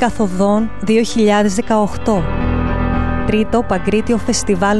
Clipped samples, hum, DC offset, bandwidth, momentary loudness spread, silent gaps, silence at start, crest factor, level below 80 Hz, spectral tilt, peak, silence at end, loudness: under 0.1%; none; 6%; 12 kHz; 5 LU; none; 0 s; 14 dB; -26 dBFS; -5.5 dB/octave; -2 dBFS; 0 s; -16 LUFS